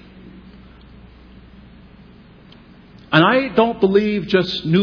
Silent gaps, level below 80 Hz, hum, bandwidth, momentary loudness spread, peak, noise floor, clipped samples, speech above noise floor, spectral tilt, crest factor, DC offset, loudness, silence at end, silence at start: none; -48 dBFS; none; 5.4 kHz; 5 LU; 0 dBFS; -44 dBFS; under 0.1%; 29 dB; -7.5 dB/octave; 20 dB; under 0.1%; -16 LUFS; 0 s; 0.25 s